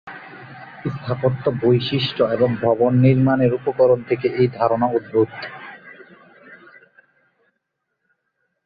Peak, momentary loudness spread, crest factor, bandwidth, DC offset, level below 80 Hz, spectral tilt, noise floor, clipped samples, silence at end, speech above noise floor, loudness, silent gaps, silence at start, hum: -4 dBFS; 22 LU; 18 dB; 5 kHz; under 0.1%; -56 dBFS; -10 dB/octave; -75 dBFS; under 0.1%; 2.1 s; 58 dB; -19 LUFS; none; 0.05 s; none